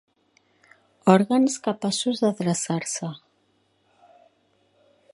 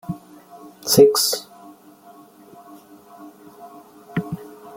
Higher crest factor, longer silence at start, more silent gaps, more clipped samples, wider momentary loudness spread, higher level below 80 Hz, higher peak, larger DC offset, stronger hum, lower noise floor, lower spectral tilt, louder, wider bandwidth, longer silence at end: about the same, 24 dB vs 22 dB; first, 1.05 s vs 0.1 s; neither; neither; second, 12 LU vs 29 LU; second, -72 dBFS vs -60 dBFS; about the same, -2 dBFS vs -2 dBFS; neither; neither; first, -67 dBFS vs -47 dBFS; about the same, -5 dB/octave vs -4 dB/octave; second, -23 LUFS vs -18 LUFS; second, 11.5 kHz vs 17 kHz; first, 2 s vs 0.05 s